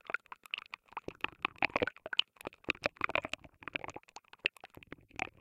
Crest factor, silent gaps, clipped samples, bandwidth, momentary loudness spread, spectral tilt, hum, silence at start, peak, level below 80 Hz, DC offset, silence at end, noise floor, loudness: 32 dB; none; under 0.1%; 16.5 kHz; 16 LU; -3 dB/octave; none; 0.1 s; -8 dBFS; -66 dBFS; under 0.1%; 0.15 s; -55 dBFS; -37 LUFS